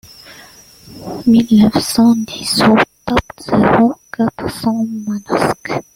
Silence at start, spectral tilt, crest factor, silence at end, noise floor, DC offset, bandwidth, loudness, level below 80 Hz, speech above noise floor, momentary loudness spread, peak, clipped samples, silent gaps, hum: 0.3 s; -5 dB/octave; 14 dB; 0.15 s; -41 dBFS; under 0.1%; 16.5 kHz; -14 LUFS; -40 dBFS; 27 dB; 9 LU; 0 dBFS; under 0.1%; none; none